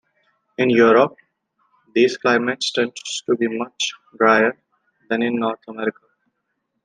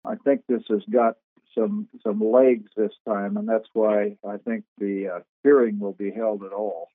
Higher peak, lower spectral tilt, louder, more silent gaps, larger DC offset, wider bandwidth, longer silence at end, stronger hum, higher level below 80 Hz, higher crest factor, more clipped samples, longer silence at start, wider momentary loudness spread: first, -2 dBFS vs -6 dBFS; second, -4 dB/octave vs -11.5 dB/octave; first, -19 LUFS vs -24 LUFS; second, none vs 1.24-1.36 s, 3.00-3.05 s, 4.68-4.76 s, 5.29-5.43 s; neither; first, 9.8 kHz vs 3.9 kHz; first, 0.95 s vs 0.1 s; neither; first, -68 dBFS vs -86 dBFS; about the same, 18 dB vs 18 dB; neither; first, 0.6 s vs 0.05 s; about the same, 11 LU vs 12 LU